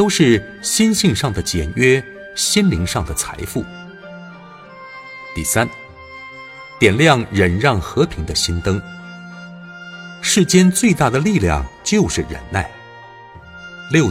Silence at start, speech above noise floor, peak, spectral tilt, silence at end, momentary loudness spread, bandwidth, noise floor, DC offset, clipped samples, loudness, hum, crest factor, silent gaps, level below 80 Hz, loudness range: 0 s; 23 dB; 0 dBFS; -4.5 dB/octave; 0 s; 22 LU; 16.5 kHz; -39 dBFS; under 0.1%; under 0.1%; -16 LUFS; none; 18 dB; none; -36 dBFS; 7 LU